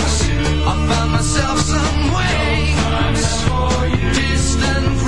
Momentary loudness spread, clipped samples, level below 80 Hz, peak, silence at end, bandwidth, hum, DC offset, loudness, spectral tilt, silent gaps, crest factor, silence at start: 1 LU; under 0.1%; -22 dBFS; -2 dBFS; 0 s; 11.5 kHz; none; 4%; -17 LUFS; -4.5 dB/octave; none; 14 dB; 0 s